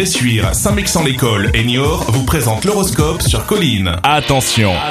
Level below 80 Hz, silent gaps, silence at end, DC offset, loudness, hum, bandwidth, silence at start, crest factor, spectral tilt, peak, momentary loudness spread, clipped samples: -26 dBFS; none; 0 s; under 0.1%; -13 LUFS; none; 15.5 kHz; 0 s; 14 dB; -4 dB/octave; 0 dBFS; 2 LU; under 0.1%